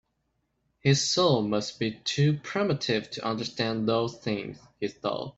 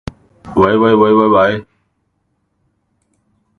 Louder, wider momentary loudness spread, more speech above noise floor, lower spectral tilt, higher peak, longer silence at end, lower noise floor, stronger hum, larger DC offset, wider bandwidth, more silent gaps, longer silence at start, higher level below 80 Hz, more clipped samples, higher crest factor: second, -27 LUFS vs -12 LUFS; second, 9 LU vs 13 LU; second, 49 dB vs 55 dB; second, -5 dB/octave vs -8 dB/octave; second, -8 dBFS vs 0 dBFS; second, 0.05 s vs 1.95 s; first, -76 dBFS vs -65 dBFS; neither; neither; first, 8.2 kHz vs 6.6 kHz; neither; first, 0.85 s vs 0.45 s; second, -64 dBFS vs -44 dBFS; neither; about the same, 20 dB vs 16 dB